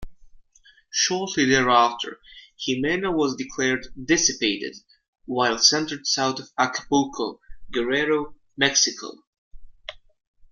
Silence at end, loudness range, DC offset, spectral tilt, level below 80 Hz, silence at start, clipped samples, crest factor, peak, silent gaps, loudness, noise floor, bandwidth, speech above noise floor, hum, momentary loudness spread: 0.55 s; 2 LU; under 0.1%; -2 dB/octave; -52 dBFS; 0 s; under 0.1%; 22 dB; -2 dBFS; 5.08-5.13 s, 9.27-9.51 s; -22 LUFS; -57 dBFS; 11 kHz; 34 dB; none; 15 LU